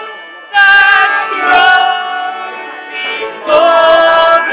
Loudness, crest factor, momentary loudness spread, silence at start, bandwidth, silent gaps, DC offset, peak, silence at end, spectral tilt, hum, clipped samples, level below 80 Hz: -8 LUFS; 10 dB; 17 LU; 0 s; 4 kHz; none; under 0.1%; 0 dBFS; 0 s; -5 dB/octave; none; 0.8%; -52 dBFS